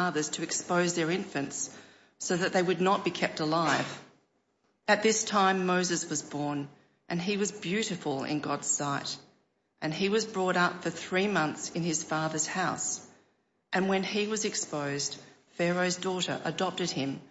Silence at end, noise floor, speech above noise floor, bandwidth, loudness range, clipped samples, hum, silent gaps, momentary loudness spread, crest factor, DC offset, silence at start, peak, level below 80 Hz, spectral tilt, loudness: 0.05 s; -74 dBFS; 44 dB; 8.2 kHz; 3 LU; under 0.1%; none; none; 9 LU; 20 dB; under 0.1%; 0 s; -12 dBFS; -76 dBFS; -3.5 dB/octave; -30 LUFS